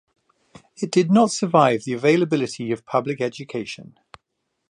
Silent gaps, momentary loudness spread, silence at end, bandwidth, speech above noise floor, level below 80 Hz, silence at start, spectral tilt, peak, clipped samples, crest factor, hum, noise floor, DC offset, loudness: none; 13 LU; 0.8 s; 10.5 kHz; 56 dB; -68 dBFS; 0.8 s; -5.5 dB/octave; -2 dBFS; under 0.1%; 20 dB; none; -76 dBFS; under 0.1%; -21 LUFS